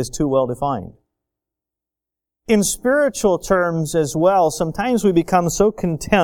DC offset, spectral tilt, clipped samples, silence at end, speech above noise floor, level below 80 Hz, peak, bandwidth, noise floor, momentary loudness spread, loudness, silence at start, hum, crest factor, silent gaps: under 0.1%; -5 dB/octave; under 0.1%; 0 s; 69 dB; -42 dBFS; 0 dBFS; 18 kHz; -87 dBFS; 7 LU; -18 LUFS; 0 s; none; 18 dB; none